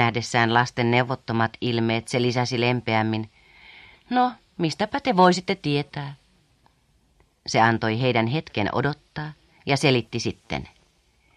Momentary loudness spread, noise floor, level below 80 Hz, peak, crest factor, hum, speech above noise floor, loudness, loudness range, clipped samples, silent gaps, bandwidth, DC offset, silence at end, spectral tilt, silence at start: 14 LU; -63 dBFS; -56 dBFS; -4 dBFS; 20 dB; none; 40 dB; -23 LUFS; 2 LU; under 0.1%; none; 11.5 kHz; under 0.1%; 0.7 s; -5.5 dB/octave; 0 s